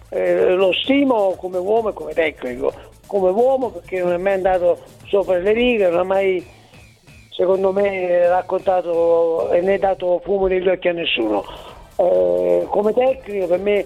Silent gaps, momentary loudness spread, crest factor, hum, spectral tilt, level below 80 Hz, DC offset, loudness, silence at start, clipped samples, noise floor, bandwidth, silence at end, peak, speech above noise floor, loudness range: none; 8 LU; 14 dB; none; -6 dB/octave; -46 dBFS; under 0.1%; -18 LUFS; 0.1 s; under 0.1%; -46 dBFS; 12 kHz; 0 s; -4 dBFS; 29 dB; 2 LU